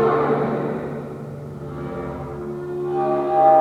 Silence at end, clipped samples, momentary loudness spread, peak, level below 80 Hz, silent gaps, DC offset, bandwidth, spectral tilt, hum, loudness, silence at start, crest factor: 0 s; under 0.1%; 15 LU; -4 dBFS; -50 dBFS; none; under 0.1%; 10 kHz; -9 dB/octave; none; -23 LUFS; 0 s; 16 dB